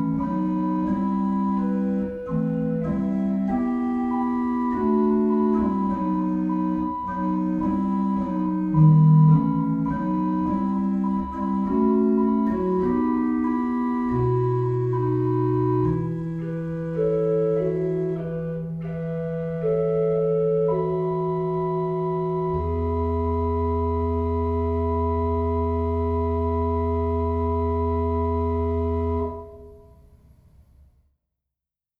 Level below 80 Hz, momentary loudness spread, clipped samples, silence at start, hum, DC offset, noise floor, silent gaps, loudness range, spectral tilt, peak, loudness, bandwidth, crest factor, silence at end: -38 dBFS; 6 LU; under 0.1%; 0 s; none; under 0.1%; -88 dBFS; none; 5 LU; -11.5 dB/octave; -8 dBFS; -23 LUFS; 4.2 kHz; 16 dB; 2.2 s